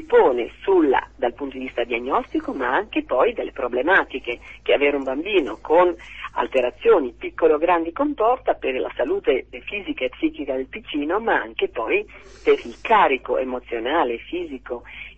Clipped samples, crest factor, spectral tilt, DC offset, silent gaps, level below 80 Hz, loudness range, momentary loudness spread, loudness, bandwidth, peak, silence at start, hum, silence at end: under 0.1%; 16 dB; -5.5 dB/octave; 0.2%; none; -50 dBFS; 4 LU; 11 LU; -22 LUFS; 7.8 kHz; -4 dBFS; 0 s; none; 0.05 s